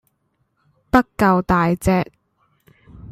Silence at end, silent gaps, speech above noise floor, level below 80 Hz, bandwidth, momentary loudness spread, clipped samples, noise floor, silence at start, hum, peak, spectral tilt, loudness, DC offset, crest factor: 0 s; none; 51 dB; -40 dBFS; 15.5 kHz; 5 LU; under 0.1%; -68 dBFS; 0.95 s; none; -2 dBFS; -7 dB/octave; -18 LUFS; under 0.1%; 20 dB